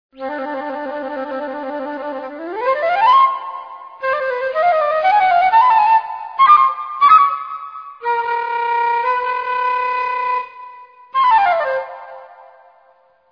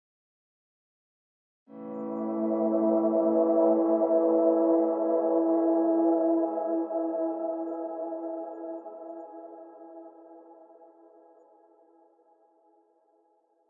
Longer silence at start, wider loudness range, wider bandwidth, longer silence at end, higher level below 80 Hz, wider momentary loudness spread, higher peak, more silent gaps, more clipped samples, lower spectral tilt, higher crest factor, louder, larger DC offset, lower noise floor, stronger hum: second, 0.2 s vs 1.7 s; second, 6 LU vs 17 LU; first, 5.4 kHz vs 2.1 kHz; second, 0.9 s vs 3.15 s; first, -62 dBFS vs under -90 dBFS; second, 16 LU vs 21 LU; first, 0 dBFS vs -12 dBFS; neither; neither; second, -4.5 dB/octave vs -12.5 dB/octave; about the same, 16 dB vs 18 dB; first, -16 LUFS vs -26 LUFS; neither; second, -54 dBFS vs -68 dBFS; neither